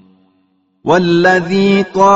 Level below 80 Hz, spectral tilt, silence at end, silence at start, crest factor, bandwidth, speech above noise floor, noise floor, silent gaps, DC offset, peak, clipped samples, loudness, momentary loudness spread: -50 dBFS; -4.5 dB/octave; 0 s; 0.85 s; 12 dB; 8 kHz; 48 dB; -58 dBFS; none; under 0.1%; 0 dBFS; under 0.1%; -11 LUFS; 4 LU